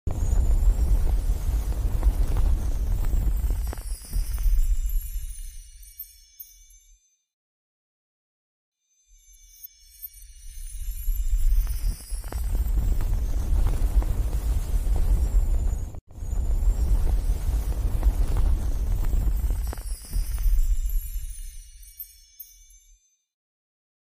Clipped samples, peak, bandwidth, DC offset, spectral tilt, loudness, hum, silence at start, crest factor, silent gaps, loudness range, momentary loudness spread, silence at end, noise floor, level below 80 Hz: under 0.1%; -10 dBFS; 16 kHz; under 0.1%; -6 dB/octave; -29 LUFS; none; 0.05 s; 14 dB; 7.34-8.72 s, 16.01-16.07 s; 15 LU; 18 LU; 1.55 s; -60 dBFS; -24 dBFS